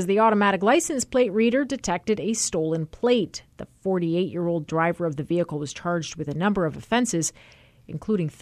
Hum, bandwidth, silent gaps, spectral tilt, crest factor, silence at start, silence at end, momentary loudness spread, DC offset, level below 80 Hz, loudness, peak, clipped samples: none; 14 kHz; none; -5 dB/octave; 16 dB; 0 s; 0.1 s; 9 LU; under 0.1%; -54 dBFS; -24 LUFS; -8 dBFS; under 0.1%